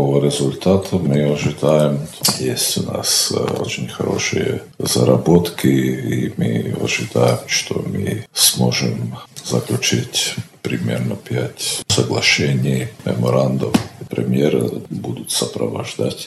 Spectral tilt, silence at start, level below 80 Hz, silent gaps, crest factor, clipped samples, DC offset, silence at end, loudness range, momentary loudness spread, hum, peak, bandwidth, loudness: -4.5 dB/octave; 0 s; -52 dBFS; none; 18 dB; under 0.1%; under 0.1%; 0 s; 2 LU; 9 LU; none; 0 dBFS; 14.5 kHz; -18 LUFS